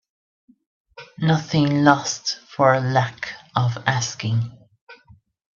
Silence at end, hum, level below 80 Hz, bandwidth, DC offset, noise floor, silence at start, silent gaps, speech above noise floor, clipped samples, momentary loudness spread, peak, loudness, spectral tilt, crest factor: 0.6 s; none; -60 dBFS; 7.4 kHz; under 0.1%; -53 dBFS; 1 s; 4.81-4.87 s; 33 dB; under 0.1%; 10 LU; 0 dBFS; -21 LUFS; -5 dB/octave; 22 dB